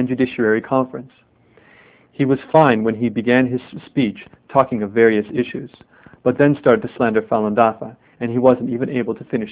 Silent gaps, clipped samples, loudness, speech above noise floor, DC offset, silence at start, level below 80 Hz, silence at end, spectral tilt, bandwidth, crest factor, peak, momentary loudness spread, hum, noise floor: none; under 0.1%; -18 LUFS; 33 dB; under 0.1%; 0 s; -56 dBFS; 0 s; -11 dB/octave; 4 kHz; 18 dB; 0 dBFS; 12 LU; none; -51 dBFS